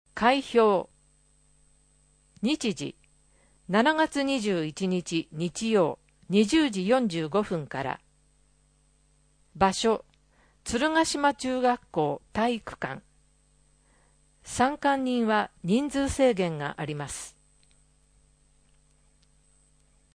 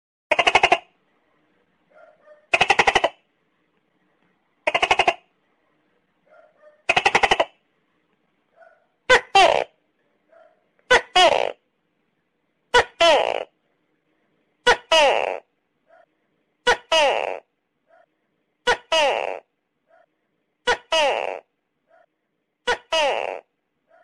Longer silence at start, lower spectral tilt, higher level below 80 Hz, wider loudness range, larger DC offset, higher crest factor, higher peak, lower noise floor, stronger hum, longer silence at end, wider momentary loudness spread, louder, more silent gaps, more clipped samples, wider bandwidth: second, 0.15 s vs 0.3 s; first, -4.5 dB/octave vs -1.5 dB/octave; about the same, -56 dBFS vs -52 dBFS; about the same, 5 LU vs 6 LU; neither; about the same, 20 dB vs 20 dB; second, -8 dBFS vs -4 dBFS; second, -64 dBFS vs -75 dBFS; first, 50 Hz at -65 dBFS vs none; first, 2.9 s vs 0.65 s; about the same, 13 LU vs 14 LU; second, -27 LUFS vs -19 LUFS; neither; neither; second, 10.5 kHz vs 13 kHz